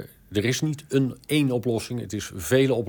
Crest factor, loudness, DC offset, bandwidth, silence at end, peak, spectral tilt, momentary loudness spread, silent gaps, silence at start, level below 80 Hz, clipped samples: 18 dB; -25 LUFS; under 0.1%; 19.5 kHz; 0 s; -8 dBFS; -5.5 dB/octave; 9 LU; none; 0 s; -56 dBFS; under 0.1%